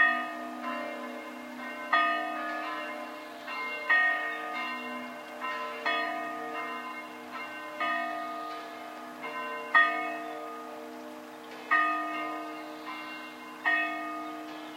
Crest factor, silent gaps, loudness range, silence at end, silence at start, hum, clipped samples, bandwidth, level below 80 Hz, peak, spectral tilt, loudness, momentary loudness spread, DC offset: 22 dB; none; 5 LU; 0 s; 0 s; none; under 0.1%; 16.5 kHz; -88 dBFS; -10 dBFS; -2.5 dB/octave; -31 LUFS; 16 LU; under 0.1%